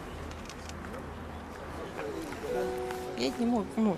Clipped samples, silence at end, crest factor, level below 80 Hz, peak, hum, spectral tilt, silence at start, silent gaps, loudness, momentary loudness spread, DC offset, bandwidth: under 0.1%; 0 s; 20 dB; -50 dBFS; -14 dBFS; none; -5.5 dB/octave; 0 s; none; -36 LUFS; 12 LU; under 0.1%; 14.5 kHz